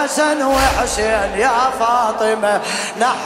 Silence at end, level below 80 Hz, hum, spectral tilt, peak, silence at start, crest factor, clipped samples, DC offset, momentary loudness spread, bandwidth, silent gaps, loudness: 0 s; -34 dBFS; none; -3 dB/octave; -2 dBFS; 0 s; 14 dB; under 0.1%; under 0.1%; 3 LU; 16 kHz; none; -16 LUFS